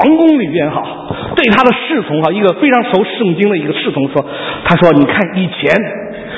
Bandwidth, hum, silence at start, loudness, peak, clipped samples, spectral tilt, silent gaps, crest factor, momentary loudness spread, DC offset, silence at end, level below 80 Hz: 8 kHz; none; 0 s; -12 LUFS; 0 dBFS; 0.3%; -8 dB/octave; none; 12 dB; 9 LU; under 0.1%; 0 s; -44 dBFS